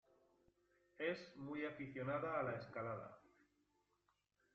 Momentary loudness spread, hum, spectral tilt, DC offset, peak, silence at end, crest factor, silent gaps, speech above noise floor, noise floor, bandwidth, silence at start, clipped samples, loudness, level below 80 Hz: 8 LU; 50 Hz at -75 dBFS; -5 dB/octave; under 0.1%; -30 dBFS; 1.35 s; 20 dB; none; 38 dB; -84 dBFS; 8 kHz; 1 s; under 0.1%; -46 LUFS; -82 dBFS